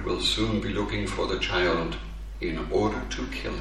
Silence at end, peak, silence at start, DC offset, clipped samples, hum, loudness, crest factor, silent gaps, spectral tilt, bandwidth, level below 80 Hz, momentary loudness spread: 0 s; -12 dBFS; 0 s; 0.3%; under 0.1%; none; -28 LUFS; 16 dB; none; -4.5 dB/octave; 13 kHz; -36 dBFS; 9 LU